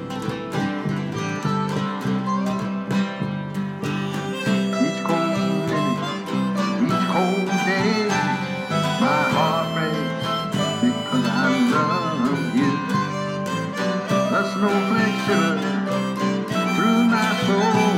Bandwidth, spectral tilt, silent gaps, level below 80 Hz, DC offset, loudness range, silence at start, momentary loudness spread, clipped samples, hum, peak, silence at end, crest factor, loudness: 16 kHz; -5.5 dB/octave; none; -60 dBFS; under 0.1%; 4 LU; 0 s; 7 LU; under 0.1%; none; -6 dBFS; 0 s; 14 dB; -22 LUFS